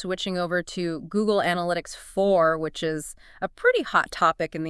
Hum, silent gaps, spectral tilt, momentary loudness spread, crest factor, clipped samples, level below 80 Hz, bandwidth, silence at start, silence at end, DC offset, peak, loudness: none; none; -4.5 dB/octave; 11 LU; 18 dB; under 0.1%; -54 dBFS; 12 kHz; 0 s; 0 s; under 0.1%; -6 dBFS; -24 LUFS